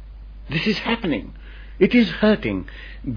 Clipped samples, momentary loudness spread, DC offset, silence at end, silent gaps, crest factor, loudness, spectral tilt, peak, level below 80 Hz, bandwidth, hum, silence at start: under 0.1%; 23 LU; under 0.1%; 0 s; none; 18 dB; -21 LUFS; -7 dB/octave; -4 dBFS; -38 dBFS; 5.4 kHz; none; 0 s